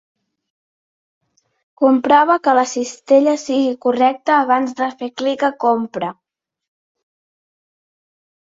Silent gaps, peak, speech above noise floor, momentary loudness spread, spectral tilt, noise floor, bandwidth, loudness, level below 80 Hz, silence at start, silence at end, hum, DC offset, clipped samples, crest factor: none; -2 dBFS; over 74 dB; 10 LU; -4 dB/octave; under -90 dBFS; 7.8 kHz; -16 LUFS; -68 dBFS; 1.8 s; 2.35 s; none; under 0.1%; under 0.1%; 16 dB